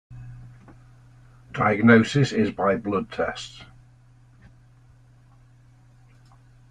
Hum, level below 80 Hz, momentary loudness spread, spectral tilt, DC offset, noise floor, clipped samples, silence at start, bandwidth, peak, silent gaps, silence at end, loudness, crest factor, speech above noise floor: none; -54 dBFS; 27 LU; -6.5 dB/octave; under 0.1%; -53 dBFS; under 0.1%; 0.1 s; 9.6 kHz; -4 dBFS; none; 3.05 s; -21 LUFS; 22 dB; 32 dB